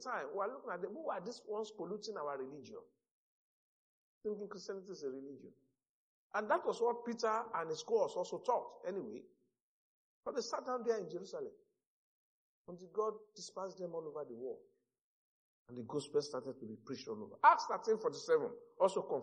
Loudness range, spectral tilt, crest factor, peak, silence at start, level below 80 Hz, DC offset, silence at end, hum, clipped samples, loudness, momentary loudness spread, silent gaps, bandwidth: 11 LU; -4 dB/octave; 26 dB; -14 dBFS; 0 s; under -90 dBFS; under 0.1%; 0 s; none; under 0.1%; -39 LUFS; 15 LU; 3.11-4.21 s, 5.89-6.30 s, 9.61-10.23 s, 11.86-12.65 s, 15.01-15.66 s; 9.4 kHz